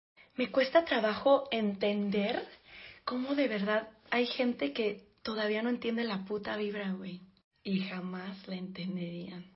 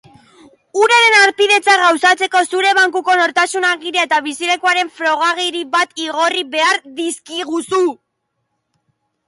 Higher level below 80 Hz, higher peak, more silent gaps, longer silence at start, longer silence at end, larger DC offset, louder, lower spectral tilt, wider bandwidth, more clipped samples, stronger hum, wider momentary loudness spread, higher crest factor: about the same, -72 dBFS vs -70 dBFS; second, -14 dBFS vs 0 dBFS; first, 7.44-7.51 s vs none; second, 0.4 s vs 0.75 s; second, 0.1 s vs 1.35 s; neither; second, -33 LUFS vs -14 LUFS; first, -9 dB/octave vs 0 dB/octave; second, 5.8 kHz vs 11.5 kHz; neither; neither; first, 14 LU vs 10 LU; about the same, 20 dB vs 16 dB